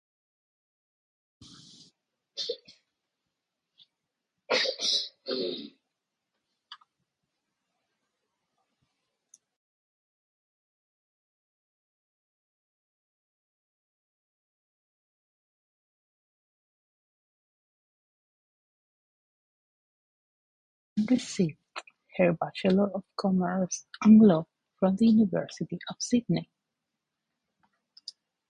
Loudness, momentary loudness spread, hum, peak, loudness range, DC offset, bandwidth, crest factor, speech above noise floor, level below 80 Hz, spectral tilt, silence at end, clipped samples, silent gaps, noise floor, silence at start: -27 LUFS; 21 LU; none; -8 dBFS; 19 LU; under 0.1%; 9.8 kHz; 24 dB; 61 dB; -70 dBFS; -5.5 dB/octave; 2.05 s; under 0.1%; 9.56-20.96 s; -85 dBFS; 2.35 s